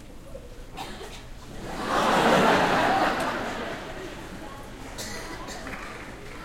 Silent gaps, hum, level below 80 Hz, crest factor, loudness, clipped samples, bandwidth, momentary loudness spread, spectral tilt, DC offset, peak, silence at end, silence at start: none; none; -44 dBFS; 20 dB; -25 LUFS; under 0.1%; 16.5 kHz; 22 LU; -4 dB/octave; under 0.1%; -6 dBFS; 0 s; 0 s